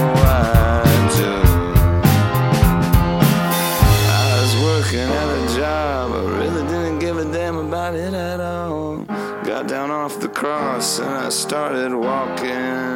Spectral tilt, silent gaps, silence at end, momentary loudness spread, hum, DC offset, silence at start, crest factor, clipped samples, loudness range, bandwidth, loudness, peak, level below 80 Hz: -5.5 dB/octave; none; 0 s; 9 LU; none; under 0.1%; 0 s; 16 dB; under 0.1%; 8 LU; 17 kHz; -18 LUFS; 0 dBFS; -26 dBFS